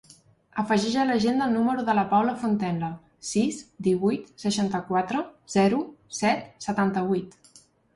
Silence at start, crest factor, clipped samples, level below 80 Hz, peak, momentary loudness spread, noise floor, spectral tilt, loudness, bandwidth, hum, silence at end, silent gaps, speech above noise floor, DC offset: 0.55 s; 16 dB; under 0.1%; -62 dBFS; -10 dBFS; 8 LU; -57 dBFS; -5.5 dB/octave; -26 LUFS; 11.5 kHz; none; 0.65 s; none; 32 dB; under 0.1%